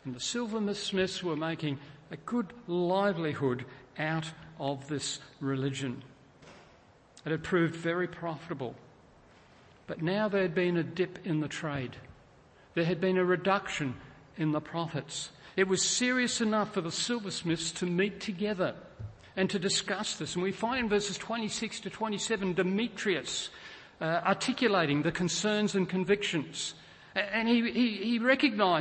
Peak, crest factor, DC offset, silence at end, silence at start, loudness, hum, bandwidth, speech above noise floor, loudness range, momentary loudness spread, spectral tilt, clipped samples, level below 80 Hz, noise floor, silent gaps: -12 dBFS; 20 dB; under 0.1%; 0 s; 0.05 s; -31 LUFS; none; 8.8 kHz; 28 dB; 5 LU; 11 LU; -4 dB/octave; under 0.1%; -64 dBFS; -59 dBFS; none